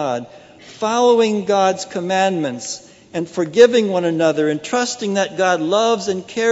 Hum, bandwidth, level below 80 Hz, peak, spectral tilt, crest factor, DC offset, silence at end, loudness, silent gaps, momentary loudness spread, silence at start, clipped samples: none; 8 kHz; -66 dBFS; 0 dBFS; -4 dB/octave; 18 dB; under 0.1%; 0 s; -17 LUFS; none; 13 LU; 0 s; under 0.1%